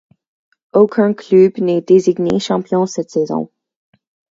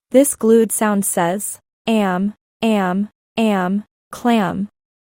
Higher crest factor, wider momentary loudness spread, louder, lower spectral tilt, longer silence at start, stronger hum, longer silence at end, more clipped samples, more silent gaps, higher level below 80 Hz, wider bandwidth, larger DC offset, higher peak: about the same, 16 dB vs 16 dB; second, 8 LU vs 12 LU; first, -15 LUFS vs -18 LUFS; first, -6.5 dB/octave vs -5 dB/octave; first, 0.75 s vs 0.1 s; neither; first, 0.85 s vs 0.45 s; neither; second, none vs 1.73-1.85 s, 2.41-2.60 s, 3.15-3.36 s, 3.91-4.11 s; about the same, -56 dBFS vs -60 dBFS; second, 7.8 kHz vs 16.5 kHz; neither; about the same, 0 dBFS vs -2 dBFS